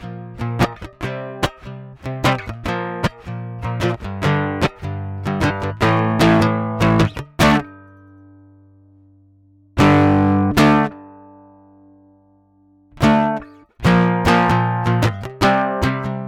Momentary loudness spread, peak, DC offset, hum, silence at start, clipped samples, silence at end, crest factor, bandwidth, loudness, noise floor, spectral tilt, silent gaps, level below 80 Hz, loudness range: 14 LU; -6 dBFS; under 0.1%; 50 Hz at -45 dBFS; 0 s; under 0.1%; 0 s; 12 dB; 17 kHz; -18 LUFS; -54 dBFS; -6.5 dB/octave; none; -38 dBFS; 6 LU